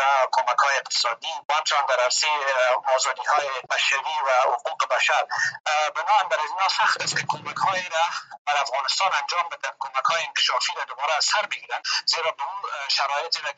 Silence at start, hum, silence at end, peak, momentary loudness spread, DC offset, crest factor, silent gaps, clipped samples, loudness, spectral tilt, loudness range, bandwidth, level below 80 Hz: 0 s; none; 0.05 s; -8 dBFS; 6 LU; under 0.1%; 16 dB; 1.45-1.49 s, 5.60-5.64 s, 8.38-8.45 s; under 0.1%; -23 LUFS; 0.5 dB/octave; 2 LU; 9.2 kHz; -84 dBFS